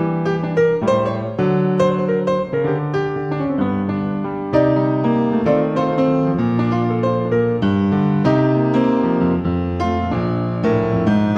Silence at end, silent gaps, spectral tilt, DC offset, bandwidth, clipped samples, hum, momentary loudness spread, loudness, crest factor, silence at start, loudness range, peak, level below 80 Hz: 0 s; none; -9 dB/octave; under 0.1%; 8 kHz; under 0.1%; none; 5 LU; -18 LUFS; 14 dB; 0 s; 2 LU; -4 dBFS; -44 dBFS